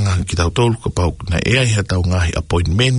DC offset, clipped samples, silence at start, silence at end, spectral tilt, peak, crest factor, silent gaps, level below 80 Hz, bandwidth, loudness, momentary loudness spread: under 0.1%; under 0.1%; 0 s; 0 s; -5 dB/octave; 0 dBFS; 16 dB; none; -30 dBFS; 11 kHz; -17 LUFS; 5 LU